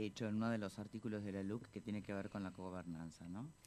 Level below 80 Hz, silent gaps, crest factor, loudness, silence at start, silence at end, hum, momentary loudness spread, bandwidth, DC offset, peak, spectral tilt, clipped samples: -72 dBFS; none; 18 dB; -46 LUFS; 0 s; 0 s; none; 10 LU; 13 kHz; under 0.1%; -28 dBFS; -7 dB/octave; under 0.1%